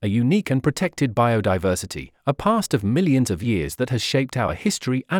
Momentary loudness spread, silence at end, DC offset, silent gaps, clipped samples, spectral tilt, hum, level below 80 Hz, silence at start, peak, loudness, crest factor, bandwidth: 5 LU; 0 s; under 0.1%; none; under 0.1%; -5.5 dB/octave; none; -48 dBFS; 0 s; -6 dBFS; -22 LUFS; 16 dB; 18 kHz